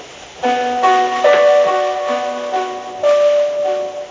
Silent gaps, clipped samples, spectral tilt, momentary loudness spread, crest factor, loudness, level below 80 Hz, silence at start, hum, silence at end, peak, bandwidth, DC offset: none; under 0.1%; -2.5 dB/octave; 10 LU; 14 dB; -15 LUFS; -58 dBFS; 0 s; none; 0 s; -2 dBFS; 7.6 kHz; under 0.1%